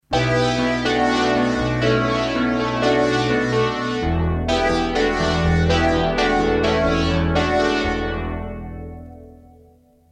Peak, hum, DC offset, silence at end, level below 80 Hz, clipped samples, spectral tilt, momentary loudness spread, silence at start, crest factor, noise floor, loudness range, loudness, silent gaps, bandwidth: -4 dBFS; none; under 0.1%; 0.8 s; -32 dBFS; under 0.1%; -6 dB/octave; 8 LU; 0.1 s; 14 dB; -52 dBFS; 3 LU; -19 LUFS; none; 10.5 kHz